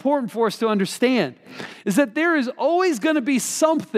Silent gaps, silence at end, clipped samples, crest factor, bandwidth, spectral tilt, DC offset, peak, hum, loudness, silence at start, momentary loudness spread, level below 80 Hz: none; 0 s; under 0.1%; 16 dB; 15.5 kHz; -4 dB/octave; under 0.1%; -6 dBFS; none; -21 LUFS; 0.05 s; 6 LU; -78 dBFS